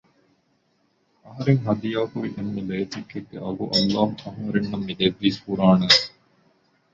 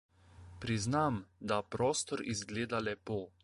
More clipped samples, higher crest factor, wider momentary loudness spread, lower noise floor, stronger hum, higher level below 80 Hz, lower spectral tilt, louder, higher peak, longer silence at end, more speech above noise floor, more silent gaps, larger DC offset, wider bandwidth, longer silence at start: neither; about the same, 22 dB vs 18 dB; first, 16 LU vs 8 LU; first, -67 dBFS vs -55 dBFS; neither; about the same, -56 dBFS vs -60 dBFS; about the same, -5.5 dB/octave vs -4.5 dB/octave; first, -22 LUFS vs -36 LUFS; first, -2 dBFS vs -18 dBFS; first, 0.85 s vs 0.15 s; first, 44 dB vs 20 dB; neither; neither; second, 7.8 kHz vs 11.5 kHz; first, 1.25 s vs 0.35 s